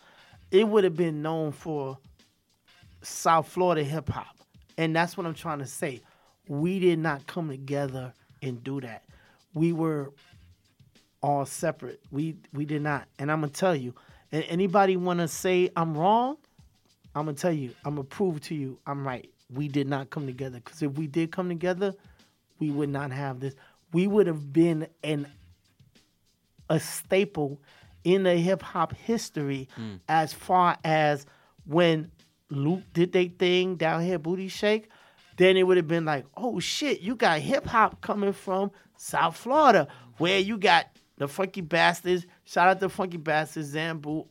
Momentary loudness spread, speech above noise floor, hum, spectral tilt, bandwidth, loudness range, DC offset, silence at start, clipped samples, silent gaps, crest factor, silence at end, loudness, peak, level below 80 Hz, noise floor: 13 LU; 43 dB; none; -5.5 dB/octave; 16.5 kHz; 7 LU; under 0.1%; 0.5 s; under 0.1%; none; 24 dB; 0.1 s; -27 LUFS; -4 dBFS; -62 dBFS; -69 dBFS